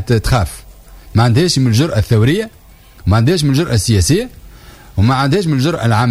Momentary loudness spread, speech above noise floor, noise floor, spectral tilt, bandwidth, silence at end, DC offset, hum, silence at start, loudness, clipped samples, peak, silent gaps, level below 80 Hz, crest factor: 11 LU; 25 dB; -37 dBFS; -5.5 dB/octave; 16 kHz; 0 s; under 0.1%; none; 0 s; -14 LUFS; under 0.1%; -2 dBFS; none; -30 dBFS; 12 dB